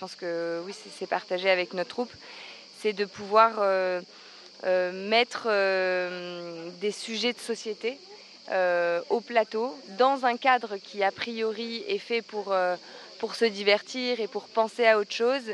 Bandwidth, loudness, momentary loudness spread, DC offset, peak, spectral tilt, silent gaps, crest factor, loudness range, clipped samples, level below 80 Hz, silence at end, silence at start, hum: 12 kHz; -27 LUFS; 14 LU; under 0.1%; -6 dBFS; -3.5 dB/octave; none; 22 dB; 4 LU; under 0.1%; -82 dBFS; 0 s; 0 s; none